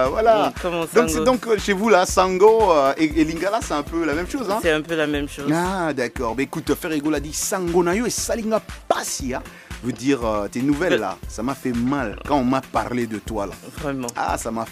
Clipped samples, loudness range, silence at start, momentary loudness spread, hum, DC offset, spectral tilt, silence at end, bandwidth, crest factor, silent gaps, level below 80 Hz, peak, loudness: under 0.1%; 6 LU; 0 s; 10 LU; none; under 0.1%; -4.5 dB/octave; 0 s; 15.5 kHz; 20 dB; none; -40 dBFS; -2 dBFS; -21 LUFS